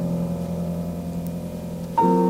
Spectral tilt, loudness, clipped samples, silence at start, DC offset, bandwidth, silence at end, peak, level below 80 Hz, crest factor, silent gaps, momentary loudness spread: -8.5 dB/octave; -26 LUFS; under 0.1%; 0 s; under 0.1%; 16 kHz; 0 s; -8 dBFS; -46 dBFS; 16 dB; none; 10 LU